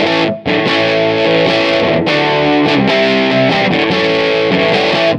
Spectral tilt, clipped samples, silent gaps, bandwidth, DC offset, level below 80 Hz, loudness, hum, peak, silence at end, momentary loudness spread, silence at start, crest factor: -5.5 dB/octave; under 0.1%; none; 10 kHz; under 0.1%; -46 dBFS; -11 LUFS; none; 0 dBFS; 0 s; 1 LU; 0 s; 12 dB